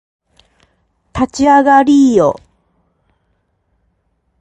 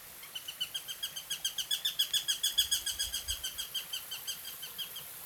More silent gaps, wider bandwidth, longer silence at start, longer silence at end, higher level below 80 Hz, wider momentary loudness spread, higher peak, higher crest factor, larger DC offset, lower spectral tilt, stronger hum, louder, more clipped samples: neither; second, 8.6 kHz vs over 20 kHz; first, 1.15 s vs 0 s; first, 2.05 s vs 0 s; first, -44 dBFS vs -60 dBFS; first, 15 LU vs 11 LU; first, 0 dBFS vs -16 dBFS; second, 14 dB vs 22 dB; neither; first, -5.5 dB/octave vs 2 dB/octave; neither; first, -10 LUFS vs -34 LUFS; neither